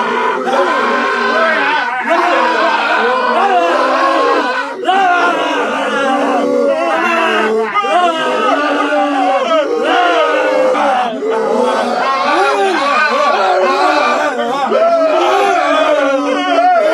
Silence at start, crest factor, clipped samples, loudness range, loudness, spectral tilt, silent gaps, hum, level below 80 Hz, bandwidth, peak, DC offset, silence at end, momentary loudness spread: 0 s; 12 dB; under 0.1%; 1 LU; -12 LUFS; -3 dB/octave; none; none; -66 dBFS; 12.5 kHz; 0 dBFS; under 0.1%; 0 s; 3 LU